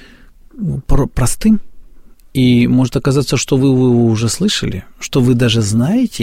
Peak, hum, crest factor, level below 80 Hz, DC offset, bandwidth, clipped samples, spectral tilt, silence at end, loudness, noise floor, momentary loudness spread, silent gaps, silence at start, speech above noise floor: 0 dBFS; none; 14 dB; -26 dBFS; under 0.1%; 16 kHz; under 0.1%; -5.5 dB/octave; 0 s; -14 LUFS; -41 dBFS; 10 LU; none; 0.55 s; 28 dB